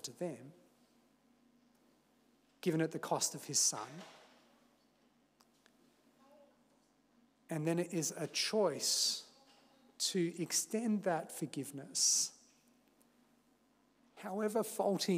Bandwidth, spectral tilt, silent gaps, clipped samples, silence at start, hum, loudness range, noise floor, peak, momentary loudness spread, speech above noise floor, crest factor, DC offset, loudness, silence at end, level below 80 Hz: 16 kHz; -3 dB/octave; none; under 0.1%; 0.05 s; 50 Hz at -75 dBFS; 7 LU; -73 dBFS; -20 dBFS; 13 LU; 36 dB; 20 dB; under 0.1%; -35 LUFS; 0 s; under -90 dBFS